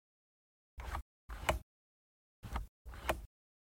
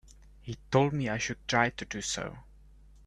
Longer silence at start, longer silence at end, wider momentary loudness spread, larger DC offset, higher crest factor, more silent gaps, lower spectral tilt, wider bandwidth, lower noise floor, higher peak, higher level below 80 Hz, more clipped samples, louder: first, 0.75 s vs 0.45 s; second, 0.4 s vs 0.65 s; about the same, 17 LU vs 16 LU; neither; first, 28 dB vs 22 dB; first, 1.02-1.29 s, 1.63-2.43 s, 2.68-2.85 s vs none; about the same, -4.5 dB/octave vs -4.5 dB/octave; first, 16.5 kHz vs 12 kHz; first, under -90 dBFS vs -55 dBFS; second, -16 dBFS vs -10 dBFS; about the same, -50 dBFS vs -54 dBFS; neither; second, -43 LUFS vs -30 LUFS